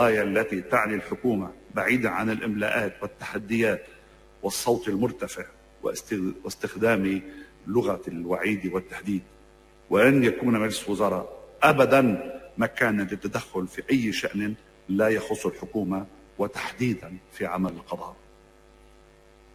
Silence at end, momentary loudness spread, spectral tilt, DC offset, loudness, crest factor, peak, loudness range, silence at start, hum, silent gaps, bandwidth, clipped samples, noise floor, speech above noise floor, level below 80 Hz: 1.4 s; 13 LU; -5.5 dB/octave; under 0.1%; -26 LUFS; 22 dB; -4 dBFS; 7 LU; 0 s; none; none; 16 kHz; under 0.1%; -54 dBFS; 29 dB; -56 dBFS